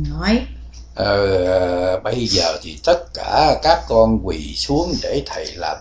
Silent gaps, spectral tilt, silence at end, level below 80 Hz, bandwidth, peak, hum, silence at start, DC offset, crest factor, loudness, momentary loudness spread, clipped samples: none; -5 dB/octave; 0 s; -32 dBFS; 8 kHz; 0 dBFS; none; 0 s; under 0.1%; 18 dB; -18 LUFS; 10 LU; under 0.1%